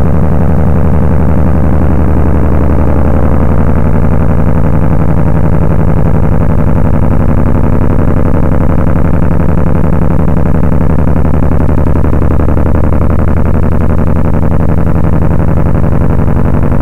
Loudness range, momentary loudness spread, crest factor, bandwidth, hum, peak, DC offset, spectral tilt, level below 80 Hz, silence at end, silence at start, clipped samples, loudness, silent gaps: 1 LU; 1 LU; 10 dB; 3.3 kHz; none; 0 dBFS; 30%; -10.5 dB/octave; -12 dBFS; 0 s; 0 s; under 0.1%; -10 LUFS; none